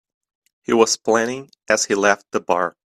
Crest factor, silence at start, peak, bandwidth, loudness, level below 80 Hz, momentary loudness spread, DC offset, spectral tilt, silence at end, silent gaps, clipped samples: 20 dB; 0.7 s; 0 dBFS; 13.5 kHz; -19 LUFS; -64 dBFS; 9 LU; under 0.1%; -2.5 dB/octave; 0.25 s; none; under 0.1%